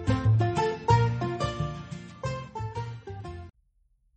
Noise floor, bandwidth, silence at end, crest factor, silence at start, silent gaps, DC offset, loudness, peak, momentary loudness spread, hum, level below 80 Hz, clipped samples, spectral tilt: -67 dBFS; 8.4 kHz; 0.65 s; 20 dB; 0 s; none; under 0.1%; -28 LUFS; -10 dBFS; 17 LU; none; -44 dBFS; under 0.1%; -7 dB/octave